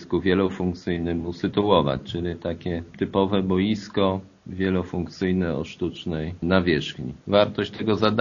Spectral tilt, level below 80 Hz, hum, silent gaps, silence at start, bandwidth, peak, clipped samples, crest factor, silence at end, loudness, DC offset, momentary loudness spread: -5.5 dB/octave; -48 dBFS; none; none; 0 s; 7.2 kHz; -2 dBFS; under 0.1%; 22 dB; 0 s; -24 LUFS; under 0.1%; 9 LU